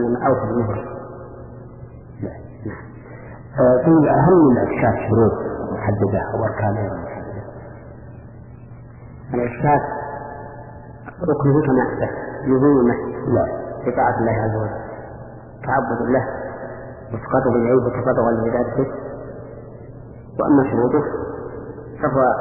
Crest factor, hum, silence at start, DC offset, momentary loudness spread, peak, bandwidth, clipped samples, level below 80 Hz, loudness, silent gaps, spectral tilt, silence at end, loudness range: 16 dB; none; 0 s; under 0.1%; 23 LU; -4 dBFS; 2.9 kHz; under 0.1%; -44 dBFS; -19 LUFS; none; -14 dB/octave; 0 s; 9 LU